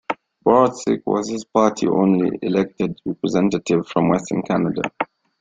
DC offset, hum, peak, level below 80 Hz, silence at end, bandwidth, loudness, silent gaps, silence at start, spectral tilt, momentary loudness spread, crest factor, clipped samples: under 0.1%; none; -2 dBFS; -56 dBFS; 0.35 s; 9 kHz; -20 LUFS; none; 0.1 s; -6.5 dB/octave; 9 LU; 18 dB; under 0.1%